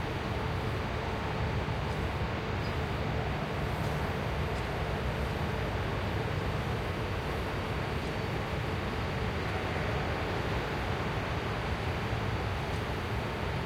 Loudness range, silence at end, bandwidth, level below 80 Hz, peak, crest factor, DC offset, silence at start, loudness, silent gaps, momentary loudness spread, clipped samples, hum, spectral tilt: 1 LU; 0 s; 16.5 kHz; -42 dBFS; -18 dBFS; 14 dB; under 0.1%; 0 s; -33 LUFS; none; 1 LU; under 0.1%; none; -6 dB/octave